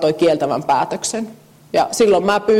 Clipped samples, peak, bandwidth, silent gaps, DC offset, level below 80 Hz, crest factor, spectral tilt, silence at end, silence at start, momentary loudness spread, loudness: under 0.1%; -6 dBFS; 16 kHz; none; under 0.1%; -54 dBFS; 12 dB; -4 dB/octave; 0 s; 0 s; 8 LU; -17 LUFS